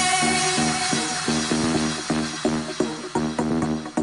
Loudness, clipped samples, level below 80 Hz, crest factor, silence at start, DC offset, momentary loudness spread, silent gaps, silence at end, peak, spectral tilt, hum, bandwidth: -23 LUFS; under 0.1%; -48 dBFS; 14 dB; 0 s; under 0.1%; 6 LU; none; 0 s; -8 dBFS; -3 dB/octave; none; 11 kHz